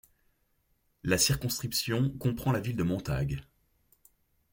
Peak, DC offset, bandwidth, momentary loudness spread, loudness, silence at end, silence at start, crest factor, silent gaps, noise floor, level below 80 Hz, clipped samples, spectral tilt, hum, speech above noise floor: -12 dBFS; under 0.1%; 17 kHz; 8 LU; -30 LUFS; 1.1 s; 1.05 s; 20 dB; none; -73 dBFS; -50 dBFS; under 0.1%; -4.5 dB/octave; none; 43 dB